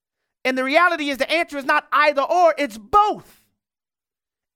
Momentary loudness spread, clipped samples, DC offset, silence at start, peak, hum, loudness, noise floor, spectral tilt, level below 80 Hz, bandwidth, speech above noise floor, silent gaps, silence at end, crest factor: 7 LU; under 0.1%; under 0.1%; 0.45 s; -4 dBFS; none; -19 LUFS; under -90 dBFS; -3 dB/octave; -54 dBFS; 17 kHz; over 71 dB; none; 1.35 s; 18 dB